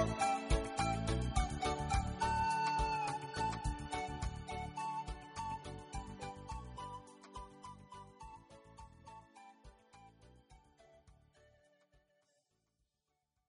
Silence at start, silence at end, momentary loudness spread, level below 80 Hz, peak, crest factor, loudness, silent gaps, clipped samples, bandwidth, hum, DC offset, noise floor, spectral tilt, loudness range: 0 s; 2.35 s; 22 LU; -48 dBFS; -20 dBFS; 22 dB; -39 LUFS; none; under 0.1%; 10.5 kHz; none; under 0.1%; -87 dBFS; -5 dB/octave; 22 LU